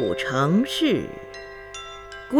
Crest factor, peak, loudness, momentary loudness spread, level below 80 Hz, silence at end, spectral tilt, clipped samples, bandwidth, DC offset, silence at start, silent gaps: 18 dB; -6 dBFS; -22 LUFS; 17 LU; -52 dBFS; 0 s; -5.5 dB/octave; under 0.1%; 18.5 kHz; under 0.1%; 0 s; none